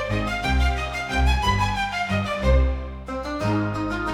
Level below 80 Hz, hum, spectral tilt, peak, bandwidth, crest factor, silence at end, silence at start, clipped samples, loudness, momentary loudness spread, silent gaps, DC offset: -26 dBFS; none; -5.5 dB/octave; -8 dBFS; 13 kHz; 16 dB; 0 s; 0 s; under 0.1%; -24 LUFS; 7 LU; none; under 0.1%